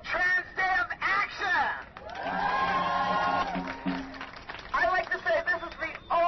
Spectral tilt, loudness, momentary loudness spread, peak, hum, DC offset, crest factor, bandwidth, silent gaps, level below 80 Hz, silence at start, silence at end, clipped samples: -4.5 dB/octave; -28 LUFS; 11 LU; -16 dBFS; none; under 0.1%; 14 dB; 6.2 kHz; none; -54 dBFS; 0 s; 0 s; under 0.1%